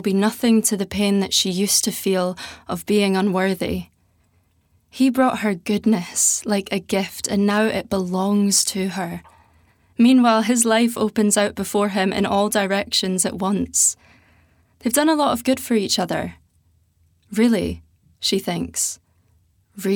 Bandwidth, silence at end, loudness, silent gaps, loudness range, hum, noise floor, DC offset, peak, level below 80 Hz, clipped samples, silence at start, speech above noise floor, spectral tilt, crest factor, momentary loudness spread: over 20 kHz; 0 s; -19 LUFS; none; 5 LU; none; -62 dBFS; under 0.1%; -2 dBFS; -54 dBFS; under 0.1%; 0 s; 42 dB; -3.5 dB/octave; 18 dB; 10 LU